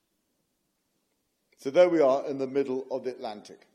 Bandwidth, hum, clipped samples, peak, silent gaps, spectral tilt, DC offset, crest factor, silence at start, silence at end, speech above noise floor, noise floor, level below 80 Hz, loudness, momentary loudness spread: 10.5 kHz; none; under 0.1%; -8 dBFS; none; -6 dB/octave; under 0.1%; 20 dB; 1.65 s; 0.2 s; 50 dB; -77 dBFS; -84 dBFS; -26 LUFS; 18 LU